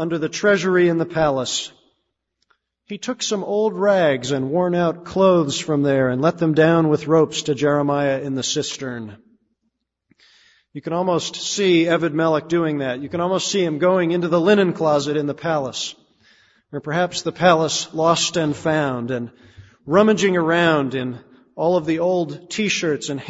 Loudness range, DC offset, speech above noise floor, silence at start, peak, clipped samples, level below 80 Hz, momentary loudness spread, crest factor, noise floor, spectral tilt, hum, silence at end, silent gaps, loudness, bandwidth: 5 LU; under 0.1%; 55 dB; 0 s; 0 dBFS; under 0.1%; -58 dBFS; 11 LU; 20 dB; -74 dBFS; -5 dB/octave; none; 0 s; none; -19 LUFS; 8 kHz